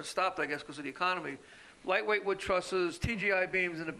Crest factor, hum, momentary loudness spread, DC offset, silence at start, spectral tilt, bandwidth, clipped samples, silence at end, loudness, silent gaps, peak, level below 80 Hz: 18 dB; none; 11 LU; under 0.1%; 0 s; -4.5 dB/octave; 13 kHz; under 0.1%; 0 s; -32 LUFS; none; -14 dBFS; -56 dBFS